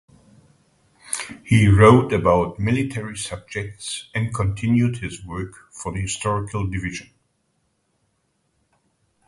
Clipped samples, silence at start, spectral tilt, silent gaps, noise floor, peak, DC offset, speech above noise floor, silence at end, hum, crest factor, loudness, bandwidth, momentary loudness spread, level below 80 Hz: under 0.1%; 1.05 s; -6 dB/octave; none; -69 dBFS; 0 dBFS; under 0.1%; 49 dB; 2.25 s; none; 22 dB; -21 LUFS; 11.5 kHz; 18 LU; -40 dBFS